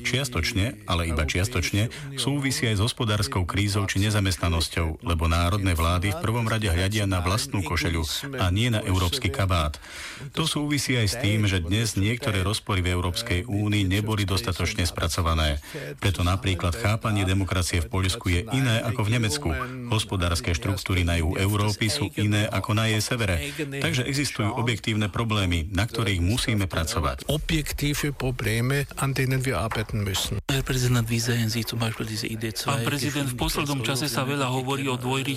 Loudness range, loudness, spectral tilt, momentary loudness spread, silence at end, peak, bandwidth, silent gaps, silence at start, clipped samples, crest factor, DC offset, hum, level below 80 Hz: 1 LU; -25 LUFS; -4.5 dB/octave; 4 LU; 0 s; -10 dBFS; 16 kHz; none; 0 s; under 0.1%; 14 dB; under 0.1%; none; -38 dBFS